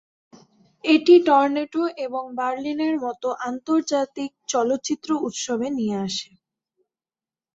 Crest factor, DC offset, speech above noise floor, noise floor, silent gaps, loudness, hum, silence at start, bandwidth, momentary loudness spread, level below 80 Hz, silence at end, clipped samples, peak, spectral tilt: 20 dB; under 0.1%; over 68 dB; under -90 dBFS; none; -22 LUFS; none; 0.85 s; 7.8 kHz; 15 LU; -70 dBFS; 1.3 s; under 0.1%; -4 dBFS; -4 dB/octave